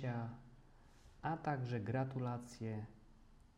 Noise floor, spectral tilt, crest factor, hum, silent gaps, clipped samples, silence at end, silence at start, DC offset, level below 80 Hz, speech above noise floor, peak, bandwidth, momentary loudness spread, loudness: -64 dBFS; -7.5 dB/octave; 20 dB; none; none; under 0.1%; 0.05 s; 0 s; under 0.1%; -66 dBFS; 22 dB; -24 dBFS; 11 kHz; 10 LU; -43 LUFS